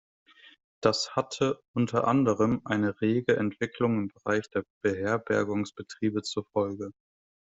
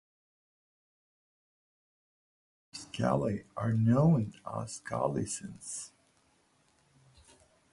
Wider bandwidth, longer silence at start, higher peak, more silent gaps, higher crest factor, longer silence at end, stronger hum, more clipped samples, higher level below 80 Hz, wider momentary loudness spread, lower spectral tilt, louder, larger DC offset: second, 8.2 kHz vs 11.5 kHz; second, 0.8 s vs 2.75 s; first, -8 dBFS vs -14 dBFS; first, 1.68-1.74 s, 4.70-4.81 s vs none; about the same, 22 dB vs 20 dB; second, 0.65 s vs 1.85 s; neither; neither; about the same, -64 dBFS vs -62 dBFS; second, 7 LU vs 17 LU; about the same, -5.5 dB/octave vs -6.5 dB/octave; first, -28 LUFS vs -32 LUFS; neither